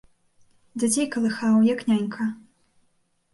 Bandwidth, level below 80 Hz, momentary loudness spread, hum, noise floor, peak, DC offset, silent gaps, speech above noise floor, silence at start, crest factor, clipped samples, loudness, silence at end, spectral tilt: 12 kHz; -70 dBFS; 12 LU; none; -68 dBFS; -10 dBFS; under 0.1%; none; 46 dB; 0.75 s; 14 dB; under 0.1%; -23 LUFS; 0.95 s; -4.5 dB/octave